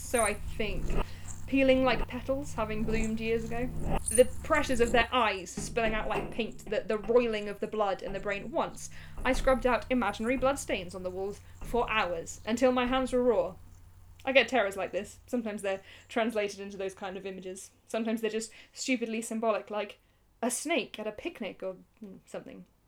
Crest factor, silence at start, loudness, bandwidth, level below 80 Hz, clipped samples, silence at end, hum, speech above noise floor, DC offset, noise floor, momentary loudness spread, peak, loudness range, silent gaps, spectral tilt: 22 dB; 0 s; -31 LUFS; 20 kHz; -42 dBFS; under 0.1%; 0.25 s; none; 22 dB; under 0.1%; -52 dBFS; 14 LU; -8 dBFS; 6 LU; none; -4 dB/octave